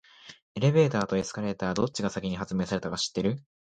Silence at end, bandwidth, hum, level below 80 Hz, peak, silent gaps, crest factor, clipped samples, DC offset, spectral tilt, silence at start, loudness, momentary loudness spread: 0.25 s; 9.4 kHz; none; -56 dBFS; -10 dBFS; 0.42-0.55 s; 18 dB; under 0.1%; under 0.1%; -5.5 dB/octave; 0.25 s; -28 LUFS; 8 LU